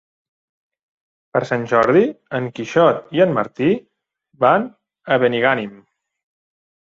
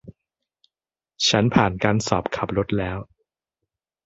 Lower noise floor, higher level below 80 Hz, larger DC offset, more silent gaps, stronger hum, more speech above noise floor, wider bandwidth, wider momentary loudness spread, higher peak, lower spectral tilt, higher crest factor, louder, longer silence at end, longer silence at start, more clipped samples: second, -62 dBFS vs under -90 dBFS; second, -60 dBFS vs -46 dBFS; neither; neither; neither; second, 46 dB vs over 69 dB; about the same, 7.6 kHz vs 8 kHz; about the same, 9 LU vs 8 LU; about the same, -2 dBFS vs -2 dBFS; first, -7 dB/octave vs -4.5 dB/octave; second, 18 dB vs 24 dB; first, -18 LUFS vs -21 LUFS; about the same, 1.1 s vs 1 s; first, 1.35 s vs 0.05 s; neither